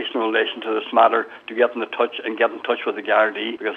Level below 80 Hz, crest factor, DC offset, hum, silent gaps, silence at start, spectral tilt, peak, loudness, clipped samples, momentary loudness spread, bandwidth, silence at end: -80 dBFS; 20 dB; under 0.1%; none; none; 0 s; -5 dB/octave; -2 dBFS; -21 LUFS; under 0.1%; 7 LU; 5.4 kHz; 0 s